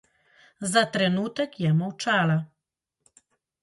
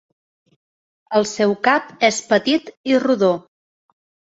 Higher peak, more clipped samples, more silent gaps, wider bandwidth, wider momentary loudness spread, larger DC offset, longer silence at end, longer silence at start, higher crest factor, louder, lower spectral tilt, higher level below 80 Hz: second, -6 dBFS vs 0 dBFS; neither; second, none vs 2.77-2.84 s; first, 11.5 kHz vs 8.2 kHz; about the same, 7 LU vs 5 LU; neither; first, 1.15 s vs 0.95 s; second, 0.6 s vs 1.1 s; about the same, 20 dB vs 20 dB; second, -25 LUFS vs -18 LUFS; about the same, -5 dB/octave vs -4 dB/octave; second, -70 dBFS vs -64 dBFS